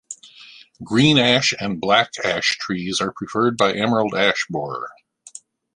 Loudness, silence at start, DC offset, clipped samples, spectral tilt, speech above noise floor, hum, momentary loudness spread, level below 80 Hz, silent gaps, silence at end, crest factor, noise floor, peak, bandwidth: -19 LUFS; 0.1 s; under 0.1%; under 0.1%; -4 dB/octave; 26 dB; none; 22 LU; -56 dBFS; none; 0.85 s; 20 dB; -45 dBFS; 0 dBFS; 11.5 kHz